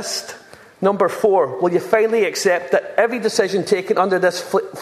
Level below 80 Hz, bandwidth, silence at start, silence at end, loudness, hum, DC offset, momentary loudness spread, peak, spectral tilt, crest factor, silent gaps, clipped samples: -66 dBFS; 14 kHz; 0 s; 0 s; -18 LUFS; none; under 0.1%; 5 LU; 0 dBFS; -4 dB/octave; 18 dB; none; under 0.1%